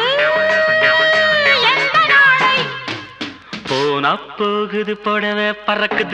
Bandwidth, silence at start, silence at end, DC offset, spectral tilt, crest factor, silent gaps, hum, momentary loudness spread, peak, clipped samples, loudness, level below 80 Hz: 10.5 kHz; 0 s; 0 s; under 0.1%; -3.5 dB/octave; 14 dB; none; none; 15 LU; -2 dBFS; under 0.1%; -14 LUFS; -58 dBFS